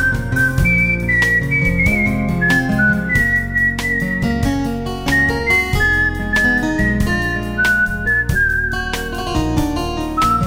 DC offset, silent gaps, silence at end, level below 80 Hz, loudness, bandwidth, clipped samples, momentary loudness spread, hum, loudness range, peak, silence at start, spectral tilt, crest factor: under 0.1%; none; 0 s; -26 dBFS; -16 LUFS; 16.5 kHz; under 0.1%; 6 LU; none; 2 LU; -2 dBFS; 0 s; -5.5 dB/octave; 14 dB